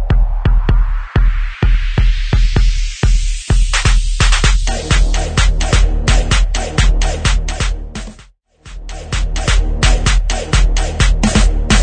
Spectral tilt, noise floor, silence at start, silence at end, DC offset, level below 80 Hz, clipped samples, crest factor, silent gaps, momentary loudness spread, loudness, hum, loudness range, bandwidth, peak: -4 dB/octave; -44 dBFS; 0 s; 0 s; under 0.1%; -14 dBFS; under 0.1%; 12 dB; none; 7 LU; -16 LUFS; none; 4 LU; 9.4 kHz; 0 dBFS